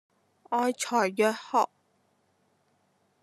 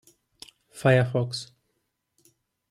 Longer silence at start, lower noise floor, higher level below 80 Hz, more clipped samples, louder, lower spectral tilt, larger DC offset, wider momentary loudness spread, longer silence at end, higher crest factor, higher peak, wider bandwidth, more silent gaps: second, 0.5 s vs 0.75 s; second, -70 dBFS vs -77 dBFS; second, under -90 dBFS vs -66 dBFS; neither; second, -28 LUFS vs -24 LUFS; second, -3.5 dB/octave vs -6 dB/octave; neither; second, 6 LU vs 24 LU; first, 1.55 s vs 1.25 s; about the same, 20 dB vs 20 dB; second, -12 dBFS vs -8 dBFS; about the same, 13 kHz vs 12.5 kHz; neither